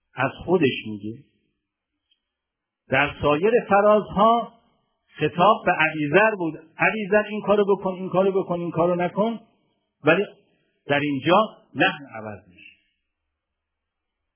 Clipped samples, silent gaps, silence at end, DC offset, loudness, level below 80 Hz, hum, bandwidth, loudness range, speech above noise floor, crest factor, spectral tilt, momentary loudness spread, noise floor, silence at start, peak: under 0.1%; none; 2 s; under 0.1%; -21 LUFS; -56 dBFS; none; 3.5 kHz; 5 LU; 63 dB; 20 dB; -9.5 dB/octave; 13 LU; -84 dBFS; 0.15 s; -4 dBFS